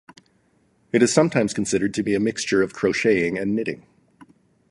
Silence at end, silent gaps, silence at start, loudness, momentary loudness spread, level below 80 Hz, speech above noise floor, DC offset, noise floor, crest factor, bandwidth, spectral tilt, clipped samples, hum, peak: 0.95 s; none; 0.95 s; -21 LUFS; 7 LU; -56 dBFS; 42 dB; under 0.1%; -63 dBFS; 22 dB; 11.5 kHz; -4.5 dB/octave; under 0.1%; none; -2 dBFS